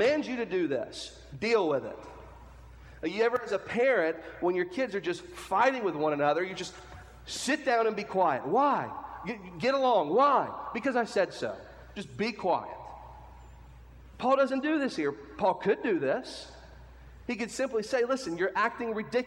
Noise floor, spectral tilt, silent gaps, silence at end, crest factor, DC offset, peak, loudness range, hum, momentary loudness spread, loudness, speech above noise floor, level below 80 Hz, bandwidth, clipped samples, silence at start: -50 dBFS; -4.5 dB/octave; none; 0 s; 18 dB; under 0.1%; -12 dBFS; 4 LU; none; 17 LU; -29 LUFS; 21 dB; -58 dBFS; 16.5 kHz; under 0.1%; 0 s